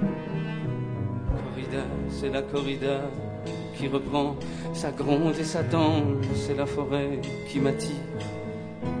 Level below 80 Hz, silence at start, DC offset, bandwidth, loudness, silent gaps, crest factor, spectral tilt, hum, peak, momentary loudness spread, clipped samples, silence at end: -44 dBFS; 0 s; under 0.1%; 10 kHz; -29 LUFS; none; 18 dB; -6.5 dB/octave; none; -10 dBFS; 10 LU; under 0.1%; 0 s